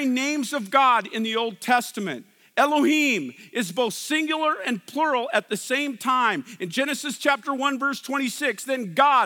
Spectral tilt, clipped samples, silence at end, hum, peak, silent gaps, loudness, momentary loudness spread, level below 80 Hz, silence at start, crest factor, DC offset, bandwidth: -3 dB/octave; under 0.1%; 0 s; none; -4 dBFS; none; -23 LUFS; 9 LU; -86 dBFS; 0 s; 20 dB; under 0.1%; 18 kHz